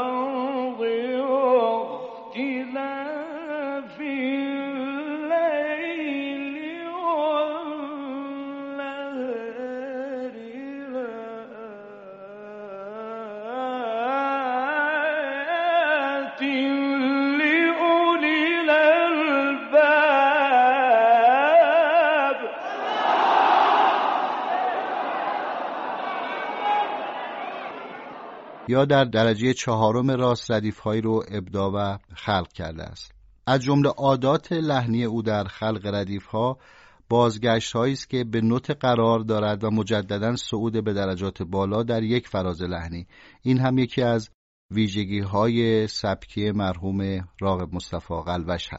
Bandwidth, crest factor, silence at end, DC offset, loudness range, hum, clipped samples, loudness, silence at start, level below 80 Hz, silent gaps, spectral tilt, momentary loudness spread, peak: 8 kHz; 18 dB; 0 s; under 0.1%; 11 LU; none; under 0.1%; -23 LUFS; 0 s; -54 dBFS; 44.34-44.69 s; -4 dB/octave; 16 LU; -6 dBFS